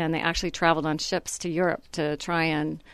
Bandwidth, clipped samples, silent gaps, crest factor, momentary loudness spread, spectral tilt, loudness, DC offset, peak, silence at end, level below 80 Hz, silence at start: 13.5 kHz; under 0.1%; none; 22 dB; 6 LU; -4.5 dB/octave; -26 LUFS; under 0.1%; -6 dBFS; 0 s; -48 dBFS; 0 s